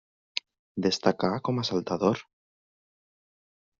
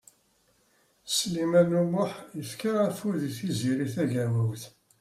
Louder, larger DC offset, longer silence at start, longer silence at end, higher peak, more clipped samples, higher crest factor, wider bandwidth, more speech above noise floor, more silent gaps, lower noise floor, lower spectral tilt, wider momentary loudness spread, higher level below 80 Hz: about the same, -28 LUFS vs -28 LUFS; neither; second, 0.35 s vs 1.05 s; first, 1.6 s vs 0.3 s; first, -6 dBFS vs -10 dBFS; neither; first, 24 dB vs 18 dB; second, 7.4 kHz vs 16 kHz; first, over 63 dB vs 40 dB; first, 0.59-0.75 s vs none; first, under -90 dBFS vs -67 dBFS; about the same, -4.5 dB/octave vs -5.5 dB/octave; second, 10 LU vs 15 LU; about the same, -68 dBFS vs -68 dBFS